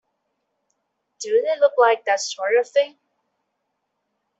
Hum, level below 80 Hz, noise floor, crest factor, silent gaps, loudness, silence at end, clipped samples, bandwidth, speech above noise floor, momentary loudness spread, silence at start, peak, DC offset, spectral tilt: none; -78 dBFS; -76 dBFS; 20 dB; none; -20 LUFS; 1.5 s; under 0.1%; 8 kHz; 57 dB; 7 LU; 1.2 s; -4 dBFS; under 0.1%; 0.5 dB/octave